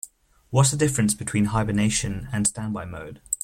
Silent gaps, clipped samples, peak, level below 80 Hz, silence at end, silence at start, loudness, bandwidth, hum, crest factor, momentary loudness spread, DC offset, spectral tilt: none; under 0.1%; -6 dBFS; -44 dBFS; 0.05 s; 0.05 s; -23 LUFS; 16 kHz; none; 18 dB; 13 LU; under 0.1%; -4.5 dB/octave